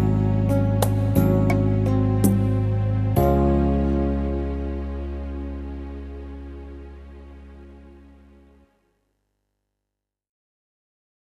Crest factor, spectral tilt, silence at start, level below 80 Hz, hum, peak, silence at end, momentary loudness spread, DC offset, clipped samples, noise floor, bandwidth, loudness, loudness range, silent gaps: 20 dB; -8.5 dB/octave; 0 s; -32 dBFS; 50 Hz at -55 dBFS; -4 dBFS; 3.3 s; 19 LU; under 0.1%; under 0.1%; -84 dBFS; 14 kHz; -22 LUFS; 20 LU; none